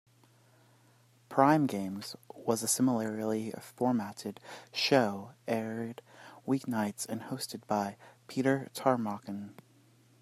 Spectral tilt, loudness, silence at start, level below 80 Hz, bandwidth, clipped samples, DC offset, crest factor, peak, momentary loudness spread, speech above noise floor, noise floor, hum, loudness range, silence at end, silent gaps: -4.5 dB/octave; -32 LUFS; 1.3 s; -78 dBFS; 15.5 kHz; under 0.1%; under 0.1%; 24 dB; -10 dBFS; 16 LU; 32 dB; -64 dBFS; none; 4 LU; 0.7 s; none